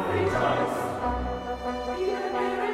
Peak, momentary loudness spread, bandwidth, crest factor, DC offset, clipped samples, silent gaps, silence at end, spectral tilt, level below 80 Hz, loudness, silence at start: -14 dBFS; 7 LU; 15.5 kHz; 14 dB; under 0.1%; under 0.1%; none; 0 s; -6 dB/octave; -42 dBFS; -28 LUFS; 0 s